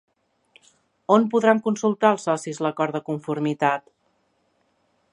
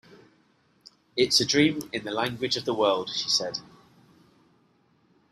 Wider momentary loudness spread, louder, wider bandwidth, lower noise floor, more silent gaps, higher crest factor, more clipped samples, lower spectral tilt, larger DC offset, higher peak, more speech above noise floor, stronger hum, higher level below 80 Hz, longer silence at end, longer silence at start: second, 9 LU vs 12 LU; first, -22 LUFS vs -25 LUFS; second, 11 kHz vs 15 kHz; about the same, -68 dBFS vs -65 dBFS; neither; about the same, 22 dB vs 22 dB; neither; first, -6 dB/octave vs -3 dB/octave; neither; first, -2 dBFS vs -8 dBFS; first, 47 dB vs 39 dB; neither; second, -76 dBFS vs -66 dBFS; second, 1.35 s vs 1.7 s; about the same, 1.1 s vs 1.15 s